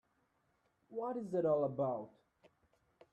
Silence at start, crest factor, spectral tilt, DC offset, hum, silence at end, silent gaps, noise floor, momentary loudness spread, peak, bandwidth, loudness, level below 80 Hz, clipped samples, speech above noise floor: 0.9 s; 18 dB; -9.5 dB/octave; under 0.1%; none; 1.05 s; none; -78 dBFS; 13 LU; -22 dBFS; 9 kHz; -38 LUFS; -82 dBFS; under 0.1%; 42 dB